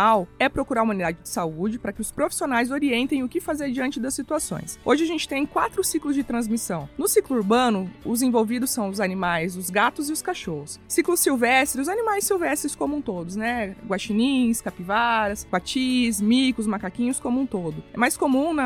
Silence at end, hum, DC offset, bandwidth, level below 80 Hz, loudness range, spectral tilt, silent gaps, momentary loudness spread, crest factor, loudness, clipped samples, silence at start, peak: 0 s; none; under 0.1%; 19 kHz; -50 dBFS; 2 LU; -3.5 dB/octave; none; 8 LU; 16 dB; -23 LUFS; under 0.1%; 0 s; -6 dBFS